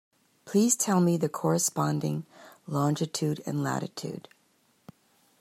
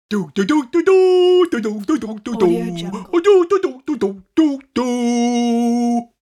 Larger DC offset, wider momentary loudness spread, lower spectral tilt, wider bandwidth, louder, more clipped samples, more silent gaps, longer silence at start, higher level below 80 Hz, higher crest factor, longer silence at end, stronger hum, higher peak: neither; first, 15 LU vs 9 LU; about the same, -5 dB/octave vs -5.5 dB/octave; first, 15.5 kHz vs 11.5 kHz; second, -28 LUFS vs -17 LUFS; neither; neither; first, 0.45 s vs 0.1 s; second, -72 dBFS vs -58 dBFS; about the same, 18 dB vs 14 dB; first, 1.2 s vs 0.2 s; neither; second, -12 dBFS vs -2 dBFS